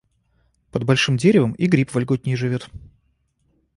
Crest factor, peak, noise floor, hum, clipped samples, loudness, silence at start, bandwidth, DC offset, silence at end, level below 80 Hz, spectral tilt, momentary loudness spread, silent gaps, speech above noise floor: 18 dB; -2 dBFS; -66 dBFS; none; under 0.1%; -20 LUFS; 0.75 s; 11.5 kHz; under 0.1%; 1 s; -52 dBFS; -6 dB/octave; 12 LU; none; 47 dB